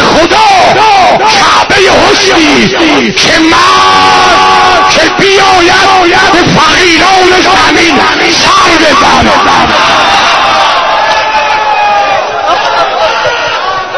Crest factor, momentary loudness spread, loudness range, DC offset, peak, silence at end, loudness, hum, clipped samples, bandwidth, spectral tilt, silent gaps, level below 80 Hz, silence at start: 4 dB; 4 LU; 3 LU; 1%; 0 dBFS; 0 s; -4 LUFS; none; 6%; 11 kHz; -2.5 dB/octave; none; -30 dBFS; 0 s